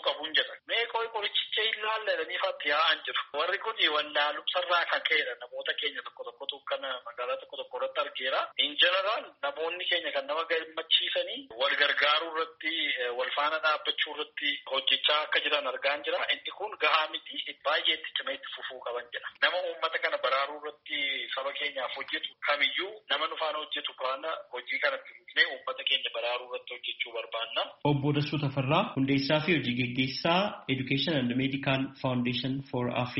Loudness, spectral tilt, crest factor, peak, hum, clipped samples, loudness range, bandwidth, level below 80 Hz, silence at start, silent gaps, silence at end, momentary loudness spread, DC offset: -29 LUFS; -1.5 dB/octave; 22 dB; -10 dBFS; none; under 0.1%; 3 LU; 5.8 kHz; -70 dBFS; 0 s; none; 0 s; 10 LU; under 0.1%